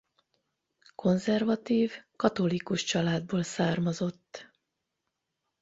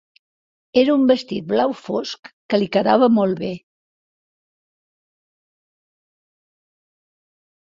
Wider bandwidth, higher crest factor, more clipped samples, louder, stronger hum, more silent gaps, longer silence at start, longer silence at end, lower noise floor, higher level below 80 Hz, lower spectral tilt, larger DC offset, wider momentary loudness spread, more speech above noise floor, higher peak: about the same, 8 kHz vs 7.6 kHz; about the same, 22 dB vs 20 dB; neither; second, -29 LUFS vs -19 LUFS; neither; second, none vs 2.19-2.23 s, 2.33-2.49 s; first, 1 s vs 0.75 s; second, 1.15 s vs 4.2 s; second, -84 dBFS vs under -90 dBFS; about the same, -66 dBFS vs -64 dBFS; about the same, -5.5 dB/octave vs -6.5 dB/octave; neither; second, 7 LU vs 14 LU; second, 55 dB vs over 72 dB; second, -10 dBFS vs -2 dBFS